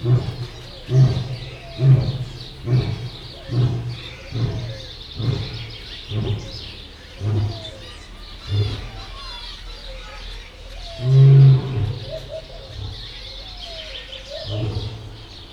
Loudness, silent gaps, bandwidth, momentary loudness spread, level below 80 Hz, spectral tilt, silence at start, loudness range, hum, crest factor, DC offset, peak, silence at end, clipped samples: -21 LUFS; none; 7 kHz; 20 LU; -38 dBFS; -7.5 dB/octave; 0 s; 12 LU; none; 18 dB; under 0.1%; -4 dBFS; 0 s; under 0.1%